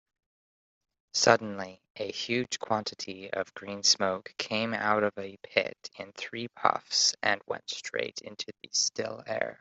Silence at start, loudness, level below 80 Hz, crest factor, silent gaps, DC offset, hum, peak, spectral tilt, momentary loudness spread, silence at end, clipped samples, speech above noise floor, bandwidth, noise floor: 1.15 s; -29 LUFS; -74 dBFS; 28 dB; 1.90-1.95 s; under 0.1%; none; -4 dBFS; -2 dB/octave; 15 LU; 0.05 s; under 0.1%; over 59 dB; 8.2 kHz; under -90 dBFS